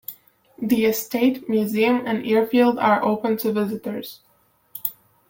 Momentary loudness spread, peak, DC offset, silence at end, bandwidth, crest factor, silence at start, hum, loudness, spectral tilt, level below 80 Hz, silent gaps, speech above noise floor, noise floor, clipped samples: 14 LU; -6 dBFS; under 0.1%; 0.4 s; 17 kHz; 16 dB; 0.1 s; none; -21 LUFS; -5.5 dB/octave; -64 dBFS; none; 30 dB; -50 dBFS; under 0.1%